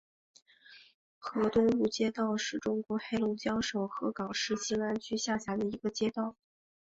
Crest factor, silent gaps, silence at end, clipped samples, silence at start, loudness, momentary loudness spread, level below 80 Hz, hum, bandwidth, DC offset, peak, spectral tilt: 18 dB; 0.94-1.21 s; 0.5 s; under 0.1%; 0.7 s; -33 LUFS; 7 LU; -64 dBFS; none; 8 kHz; under 0.1%; -16 dBFS; -4 dB/octave